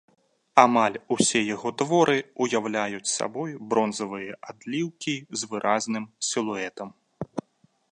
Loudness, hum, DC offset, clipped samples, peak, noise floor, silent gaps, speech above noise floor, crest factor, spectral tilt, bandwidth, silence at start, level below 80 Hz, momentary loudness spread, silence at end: -25 LUFS; none; under 0.1%; under 0.1%; 0 dBFS; -65 dBFS; none; 40 dB; 26 dB; -3.5 dB/octave; 11 kHz; 0.55 s; -70 dBFS; 15 LU; 0.5 s